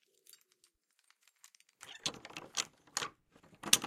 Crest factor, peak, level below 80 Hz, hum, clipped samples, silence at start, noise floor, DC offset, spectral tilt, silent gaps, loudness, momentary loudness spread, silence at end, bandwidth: 38 dB; -4 dBFS; -78 dBFS; none; under 0.1%; 1.8 s; -74 dBFS; under 0.1%; 0.5 dB/octave; none; -39 LUFS; 22 LU; 0 s; 16 kHz